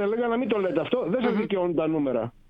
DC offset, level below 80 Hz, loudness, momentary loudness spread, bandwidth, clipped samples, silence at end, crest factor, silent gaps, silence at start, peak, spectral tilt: under 0.1%; -58 dBFS; -25 LUFS; 1 LU; 5.4 kHz; under 0.1%; 0.2 s; 16 dB; none; 0 s; -10 dBFS; -9 dB/octave